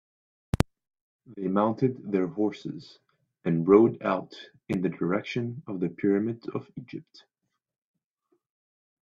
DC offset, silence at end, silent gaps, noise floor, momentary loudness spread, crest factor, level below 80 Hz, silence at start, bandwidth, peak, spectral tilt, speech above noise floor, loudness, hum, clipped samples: under 0.1%; 2.1 s; 1.01-1.19 s; -75 dBFS; 20 LU; 28 dB; -52 dBFS; 0.55 s; 13.5 kHz; 0 dBFS; -8 dB/octave; 48 dB; -27 LUFS; none; under 0.1%